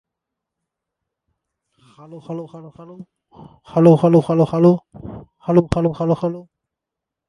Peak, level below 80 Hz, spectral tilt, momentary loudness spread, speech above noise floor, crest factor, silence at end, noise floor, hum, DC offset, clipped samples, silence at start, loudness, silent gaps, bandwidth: 0 dBFS; -46 dBFS; -9.5 dB/octave; 23 LU; 67 dB; 20 dB; 0.85 s; -84 dBFS; none; under 0.1%; under 0.1%; 2.1 s; -16 LUFS; none; 11 kHz